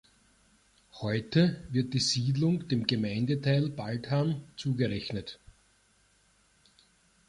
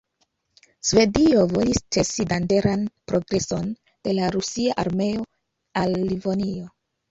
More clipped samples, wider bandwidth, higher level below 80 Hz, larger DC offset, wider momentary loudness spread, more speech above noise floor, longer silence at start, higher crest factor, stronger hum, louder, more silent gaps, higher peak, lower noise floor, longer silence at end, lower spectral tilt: neither; first, 11.5 kHz vs 8.2 kHz; second, -60 dBFS vs -46 dBFS; neither; second, 10 LU vs 13 LU; second, 38 dB vs 49 dB; about the same, 0.95 s vs 0.85 s; about the same, 22 dB vs 18 dB; neither; second, -30 LUFS vs -23 LUFS; neither; second, -10 dBFS vs -4 dBFS; second, -67 dBFS vs -71 dBFS; first, 1.95 s vs 0.45 s; about the same, -5.5 dB/octave vs -5 dB/octave